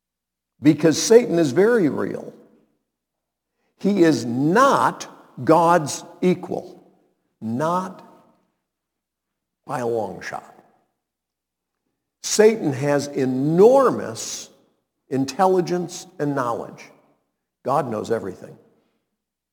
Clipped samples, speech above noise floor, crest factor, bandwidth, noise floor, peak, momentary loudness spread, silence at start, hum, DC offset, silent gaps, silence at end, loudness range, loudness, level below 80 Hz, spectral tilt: under 0.1%; 65 dB; 20 dB; 19 kHz; -85 dBFS; 0 dBFS; 17 LU; 0.6 s; none; under 0.1%; none; 1 s; 12 LU; -20 LUFS; -70 dBFS; -5.5 dB/octave